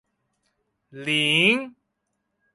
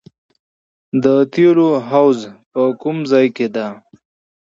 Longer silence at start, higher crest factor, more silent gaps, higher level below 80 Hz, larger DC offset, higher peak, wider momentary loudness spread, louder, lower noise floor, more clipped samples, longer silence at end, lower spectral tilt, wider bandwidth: about the same, 0.95 s vs 0.95 s; about the same, 20 dB vs 16 dB; second, none vs 2.46-2.51 s; second, -72 dBFS vs -64 dBFS; neither; second, -6 dBFS vs 0 dBFS; first, 17 LU vs 10 LU; second, -20 LUFS vs -15 LUFS; second, -77 dBFS vs under -90 dBFS; neither; first, 0.85 s vs 0.65 s; second, -3.5 dB/octave vs -7.5 dB/octave; first, 11.5 kHz vs 7.6 kHz